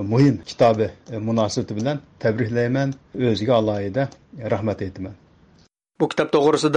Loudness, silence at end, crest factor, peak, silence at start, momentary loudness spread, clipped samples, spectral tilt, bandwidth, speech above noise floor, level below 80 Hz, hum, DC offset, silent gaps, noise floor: -22 LUFS; 0 s; 16 dB; -6 dBFS; 0 s; 11 LU; under 0.1%; -6.5 dB/octave; 10 kHz; 36 dB; -56 dBFS; none; under 0.1%; none; -57 dBFS